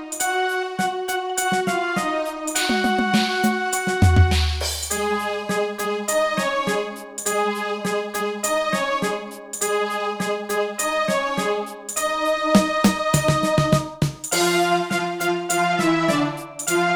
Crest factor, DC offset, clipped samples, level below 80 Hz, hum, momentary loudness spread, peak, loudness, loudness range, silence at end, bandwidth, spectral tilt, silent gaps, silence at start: 20 dB; under 0.1%; under 0.1%; -36 dBFS; none; 7 LU; -2 dBFS; -21 LUFS; 4 LU; 0 s; over 20 kHz; -4 dB/octave; none; 0 s